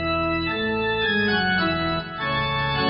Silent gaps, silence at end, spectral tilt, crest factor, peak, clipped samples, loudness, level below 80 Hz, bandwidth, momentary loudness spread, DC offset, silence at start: none; 0 s; -2.5 dB/octave; 14 dB; -10 dBFS; under 0.1%; -22 LUFS; -42 dBFS; 5.4 kHz; 5 LU; under 0.1%; 0 s